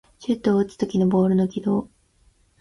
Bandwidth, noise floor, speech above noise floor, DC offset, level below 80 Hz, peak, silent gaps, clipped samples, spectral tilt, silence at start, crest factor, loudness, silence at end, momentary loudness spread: 11 kHz; -60 dBFS; 39 dB; under 0.1%; -54 dBFS; -8 dBFS; none; under 0.1%; -8.5 dB/octave; 0.2 s; 14 dB; -22 LUFS; 0.75 s; 6 LU